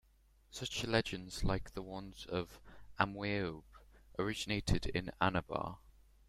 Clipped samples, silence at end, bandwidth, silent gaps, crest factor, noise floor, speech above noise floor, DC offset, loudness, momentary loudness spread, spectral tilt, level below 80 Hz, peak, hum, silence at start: under 0.1%; 0.4 s; 15.5 kHz; none; 26 dB; -68 dBFS; 30 dB; under 0.1%; -39 LUFS; 14 LU; -5 dB/octave; -50 dBFS; -14 dBFS; none; 0.5 s